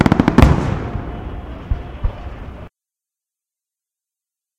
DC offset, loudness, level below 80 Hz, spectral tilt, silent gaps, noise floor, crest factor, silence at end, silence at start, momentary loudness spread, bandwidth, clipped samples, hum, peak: under 0.1%; -18 LUFS; -26 dBFS; -7.5 dB/octave; none; -87 dBFS; 20 dB; 1.9 s; 0 s; 21 LU; 14.5 kHz; 0.1%; none; 0 dBFS